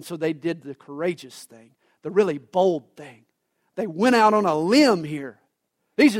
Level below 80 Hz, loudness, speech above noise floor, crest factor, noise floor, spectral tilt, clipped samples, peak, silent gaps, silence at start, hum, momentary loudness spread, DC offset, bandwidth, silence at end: -70 dBFS; -22 LUFS; 53 dB; 18 dB; -75 dBFS; -5 dB/octave; under 0.1%; -6 dBFS; none; 0 s; none; 20 LU; under 0.1%; 16 kHz; 0 s